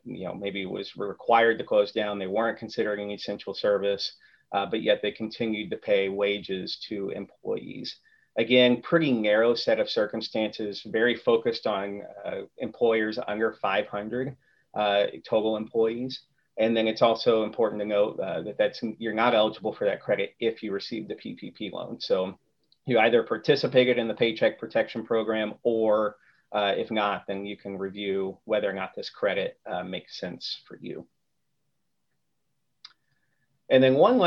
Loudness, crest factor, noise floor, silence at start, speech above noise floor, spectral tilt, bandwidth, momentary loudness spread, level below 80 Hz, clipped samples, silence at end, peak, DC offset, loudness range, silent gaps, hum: -27 LUFS; 20 dB; -81 dBFS; 0.05 s; 54 dB; -6 dB/octave; 6.8 kHz; 13 LU; -70 dBFS; under 0.1%; 0 s; -6 dBFS; under 0.1%; 6 LU; none; none